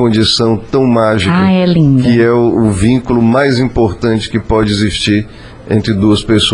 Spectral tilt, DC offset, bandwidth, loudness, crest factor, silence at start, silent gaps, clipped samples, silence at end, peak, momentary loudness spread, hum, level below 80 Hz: -6 dB/octave; under 0.1%; 10.5 kHz; -11 LUFS; 10 dB; 0 s; none; under 0.1%; 0 s; 0 dBFS; 5 LU; none; -30 dBFS